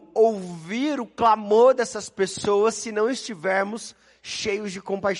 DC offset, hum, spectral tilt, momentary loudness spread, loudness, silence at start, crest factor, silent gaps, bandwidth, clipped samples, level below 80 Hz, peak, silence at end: under 0.1%; none; -4 dB/octave; 14 LU; -23 LUFS; 0.15 s; 16 dB; none; 11.5 kHz; under 0.1%; -62 dBFS; -6 dBFS; 0 s